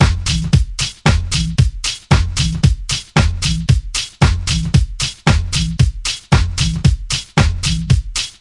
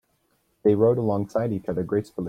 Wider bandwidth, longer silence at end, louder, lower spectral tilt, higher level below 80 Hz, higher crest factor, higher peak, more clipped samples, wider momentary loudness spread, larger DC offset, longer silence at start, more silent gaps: first, 11.5 kHz vs 10 kHz; about the same, 0.1 s vs 0 s; first, -16 LUFS vs -24 LUFS; second, -4.5 dB/octave vs -9.5 dB/octave; first, -22 dBFS vs -58 dBFS; about the same, 16 dB vs 18 dB; first, 0 dBFS vs -8 dBFS; neither; second, 4 LU vs 7 LU; neither; second, 0 s vs 0.65 s; neither